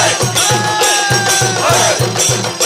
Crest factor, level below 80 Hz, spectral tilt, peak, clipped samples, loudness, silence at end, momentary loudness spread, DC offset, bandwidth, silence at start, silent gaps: 12 dB; -44 dBFS; -2 dB/octave; 0 dBFS; under 0.1%; -11 LUFS; 0 s; 2 LU; under 0.1%; 16 kHz; 0 s; none